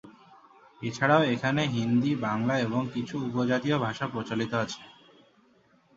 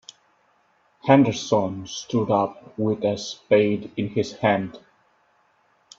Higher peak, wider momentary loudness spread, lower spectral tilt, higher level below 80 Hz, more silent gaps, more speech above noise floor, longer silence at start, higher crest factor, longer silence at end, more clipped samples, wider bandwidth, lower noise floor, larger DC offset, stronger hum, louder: second, -6 dBFS vs -2 dBFS; about the same, 10 LU vs 12 LU; about the same, -6 dB/octave vs -6 dB/octave; about the same, -64 dBFS vs -64 dBFS; neither; second, 36 dB vs 42 dB; second, 0.05 s vs 1.05 s; about the same, 22 dB vs 22 dB; second, 1.05 s vs 1.2 s; neither; about the same, 7.8 kHz vs 7.8 kHz; about the same, -63 dBFS vs -63 dBFS; neither; neither; second, -28 LUFS vs -23 LUFS